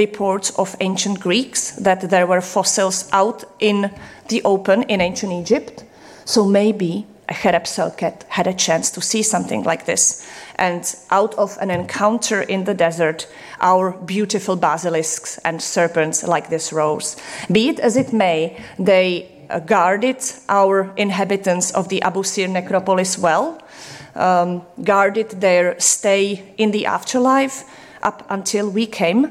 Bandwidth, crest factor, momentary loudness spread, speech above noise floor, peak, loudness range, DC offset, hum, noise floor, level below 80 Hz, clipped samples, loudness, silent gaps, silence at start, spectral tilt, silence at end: 15.5 kHz; 16 dB; 9 LU; 20 dB; -2 dBFS; 2 LU; under 0.1%; none; -38 dBFS; -58 dBFS; under 0.1%; -18 LUFS; none; 0 s; -3.5 dB/octave; 0 s